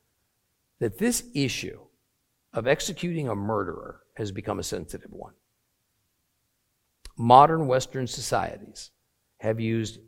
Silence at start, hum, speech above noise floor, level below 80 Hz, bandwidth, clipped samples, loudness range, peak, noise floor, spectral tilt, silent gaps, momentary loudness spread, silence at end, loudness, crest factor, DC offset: 0.8 s; none; 49 dB; -54 dBFS; 16.5 kHz; under 0.1%; 12 LU; -2 dBFS; -74 dBFS; -5 dB/octave; none; 23 LU; 0.1 s; -25 LUFS; 26 dB; under 0.1%